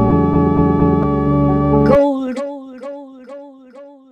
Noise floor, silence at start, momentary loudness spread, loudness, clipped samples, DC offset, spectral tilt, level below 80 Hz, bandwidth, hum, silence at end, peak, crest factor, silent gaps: -40 dBFS; 0 s; 22 LU; -14 LUFS; under 0.1%; under 0.1%; -10 dB/octave; -30 dBFS; 8.4 kHz; none; 0.2 s; 0 dBFS; 16 dB; none